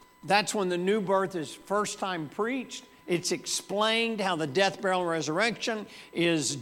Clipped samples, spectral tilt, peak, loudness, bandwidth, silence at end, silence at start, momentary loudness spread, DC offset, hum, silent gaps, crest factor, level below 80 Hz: under 0.1%; -3.5 dB/octave; -8 dBFS; -28 LUFS; 17 kHz; 0 s; 0.25 s; 8 LU; under 0.1%; none; none; 22 dB; -72 dBFS